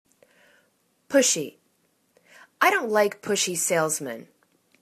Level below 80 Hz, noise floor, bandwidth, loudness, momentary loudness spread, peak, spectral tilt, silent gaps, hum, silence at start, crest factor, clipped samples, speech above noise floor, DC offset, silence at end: -76 dBFS; -68 dBFS; 14 kHz; -23 LUFS; 13 LU; -6 dBFS; -2 dB/octave; none; none; 1.1 s; 22 dB; under 0.1%; 45 dB; under 0.1%; 0.6 s